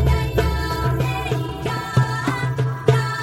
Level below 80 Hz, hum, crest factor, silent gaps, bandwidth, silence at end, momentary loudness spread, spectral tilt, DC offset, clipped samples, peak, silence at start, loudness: -28 dBFS; none; 18 dB; none; 15.5 kHz; 0 s; 5 LU; -6.5 dB/octave; under 0.1%; under 0.1%; -2 dBFS; 0 s; -21 LUFS